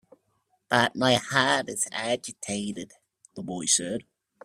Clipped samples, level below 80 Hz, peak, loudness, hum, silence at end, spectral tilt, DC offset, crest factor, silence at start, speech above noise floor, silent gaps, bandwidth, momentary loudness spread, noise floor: under 0.1%; -66 dBFS; -4 dBFS; -26 LUFS; none; 0.45 s; -2.5 dB/octave; under 0.1%; 24 dB; 0.7 s; 46 dB; none; 15.5 kHz; 16 LU; -72 dBFS